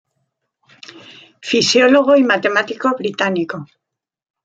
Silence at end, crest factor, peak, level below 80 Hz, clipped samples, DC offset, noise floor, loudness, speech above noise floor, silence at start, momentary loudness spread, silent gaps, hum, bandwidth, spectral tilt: 0.8 s; 16 dB; -2 dBFS; -64 dBFS; under 0.1%; under 0.1%; -83 dBFS; -15 LUFS; 68 dB; 0.95 s; 17 LU; none; none; 9 kHz; -3.5 dB/octave